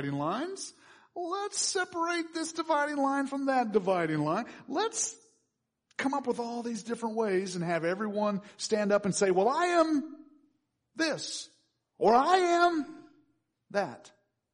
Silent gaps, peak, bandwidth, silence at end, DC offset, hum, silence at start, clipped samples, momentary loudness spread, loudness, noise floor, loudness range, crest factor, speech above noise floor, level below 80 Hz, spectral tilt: none; -12 dBFS; 10.5 kHz; 0.45 s; under 0.1%; none; 0 s; under 0.1%; 12 LU; -30 LUFS; -81 dBFS; 4 LU; 18 dB; 51 dB; -76 dBFS; -4 dB/octave